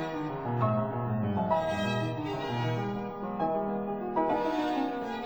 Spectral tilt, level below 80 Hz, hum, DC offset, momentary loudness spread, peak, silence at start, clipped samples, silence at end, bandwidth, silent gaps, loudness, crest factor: -7.5 dB/octave; -58 dBFS; none; 0.1%; 5 LU; -14 dBFS; 0 s; under 0.1%; 0 s; over 20 kHz; none; -31 LUFS; 16 dB